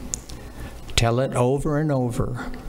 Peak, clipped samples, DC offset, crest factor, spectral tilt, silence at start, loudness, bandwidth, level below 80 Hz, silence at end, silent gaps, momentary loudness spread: -4 dBFS; under 0.1%; under 0.1%; 20 dB; -5.5 dB/octave; 0 s; -23 LUFS; 16 kHz; -34 dBFS; 0 s; none; 17 LU